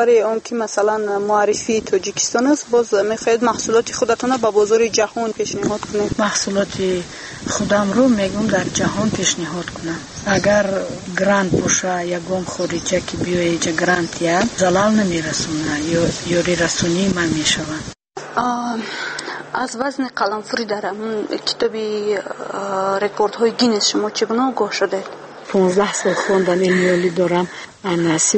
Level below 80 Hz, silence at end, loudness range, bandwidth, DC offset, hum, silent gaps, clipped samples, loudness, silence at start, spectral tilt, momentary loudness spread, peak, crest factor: -48 dBFS; 0 s; 4 LU; 8.8 kHz; under 0.1%; none; none; under 0.1%; -18 LUFS; 0 s; -4 dB/octave; 9 LU; -4 dBFS; 14 dB